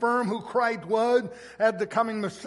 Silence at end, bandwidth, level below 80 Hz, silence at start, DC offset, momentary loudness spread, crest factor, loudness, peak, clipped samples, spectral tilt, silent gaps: 0 s; 11.5 kHz; -68 dBFS; 0 s; under 0.1%; 4 LU; 16 dB; -26 LUFS; -10 dBFS; under 0.1%; -5.5 dB/octave; none